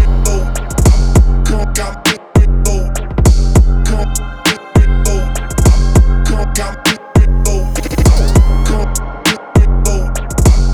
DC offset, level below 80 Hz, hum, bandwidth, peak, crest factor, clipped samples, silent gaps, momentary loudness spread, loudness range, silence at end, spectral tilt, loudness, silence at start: under 0.1%; -12 dBFS; none; 16 kHz; 0 dBFS; 10 dB; under 0.1%; none; 7 LU; 1 LU; 0 s; -5 dB/octave; -13 LUFS; 0 s